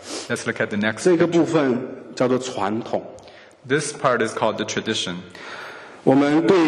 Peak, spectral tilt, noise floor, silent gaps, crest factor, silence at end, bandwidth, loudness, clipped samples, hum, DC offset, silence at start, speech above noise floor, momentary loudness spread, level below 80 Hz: 0 dBFS; -5 dB/octave; -44 dBFS; none; 20 dB; 0 s; 12 kHz; -21 LUFS; under 0.1%; none; under 0.1%; 0 s; 24 dB; 17 LU; -64 dBFS